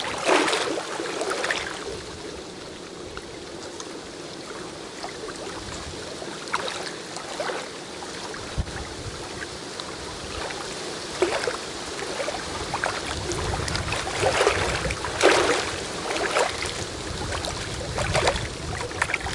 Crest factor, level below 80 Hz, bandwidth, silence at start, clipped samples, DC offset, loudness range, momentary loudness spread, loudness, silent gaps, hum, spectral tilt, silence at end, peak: 26 dB; -44 dBFS; 11.5 kHz; 0 s; under 0.1%; under 0.1%; 12 LU; 14 LU; -27 LUFS; none; none; -3 dB/octave; 0 s; -2 dBFS